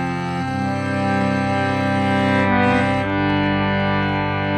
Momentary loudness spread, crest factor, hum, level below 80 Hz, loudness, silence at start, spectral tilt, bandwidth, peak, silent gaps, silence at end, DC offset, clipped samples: 6 LU; 12 dB; none; -44 dBFS; -19 LUFS; 0 s; -7 dB/octave; 9.8 kHz; -6 dBFS; none; 0 s; under 0.1%; under 0.1%